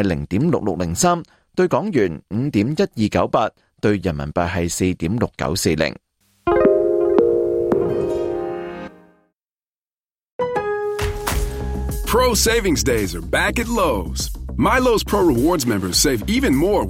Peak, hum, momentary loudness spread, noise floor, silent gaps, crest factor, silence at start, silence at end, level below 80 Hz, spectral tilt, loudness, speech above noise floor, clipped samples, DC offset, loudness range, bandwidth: -2 dBFS; none; 9 LU; under -90 dBFS; 9.78-9.82 s, 10.32-10.39 s; 18 dB; 0 s; 0 s; -32 dBFS; -4.5 dB/octave; -19 LUFS; over 71 dB; under 0.1%; under 0.1%; 7 LU; 16.5 kHz